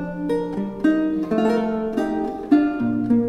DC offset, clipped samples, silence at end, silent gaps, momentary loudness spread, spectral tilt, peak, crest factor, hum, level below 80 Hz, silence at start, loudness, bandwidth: under 0.1%; under 0.1%; 0 s; none; 6 LU; -8 dB/octave; -6 dBFS; 16 dB; none; -48 dBFS; 0 s; -22 LUFS; 9.4 kHz